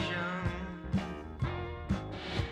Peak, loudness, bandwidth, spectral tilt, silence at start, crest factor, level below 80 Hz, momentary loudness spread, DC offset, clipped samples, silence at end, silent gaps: -20 dBFS; -37 LUFS; 10.5 kHz; -6.5 dB/octave; 0 s; 16 dB; -46 dBFS; 6 LU; under 0.1%; under 0.1%; 0 s; none